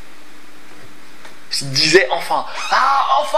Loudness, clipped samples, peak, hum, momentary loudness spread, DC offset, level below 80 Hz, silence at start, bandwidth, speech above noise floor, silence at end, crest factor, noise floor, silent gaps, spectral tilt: -15 LUFS; under 0.1%; 0 dBFS; none; 10 LU; 5%; -58 dBFS; 0.8 s; 16 kHz; 28 dB; 0 s; 18 dB; -43 dBFS; none; -2.5 dB/octave